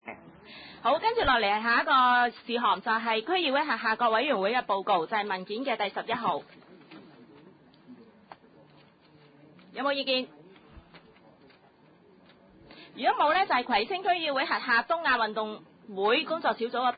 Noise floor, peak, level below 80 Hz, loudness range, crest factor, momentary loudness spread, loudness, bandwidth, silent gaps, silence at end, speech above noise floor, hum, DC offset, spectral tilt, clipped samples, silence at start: -59 dBFS; -12 dBFS; -60 dBFS; 11 LU; 18 dB; 12 LU; -27 LUFS; 5 kHz; none; 0 s; 32 dB; none; under 0.1%; -7.5 dB/octave; under 0.1%; 0.05 s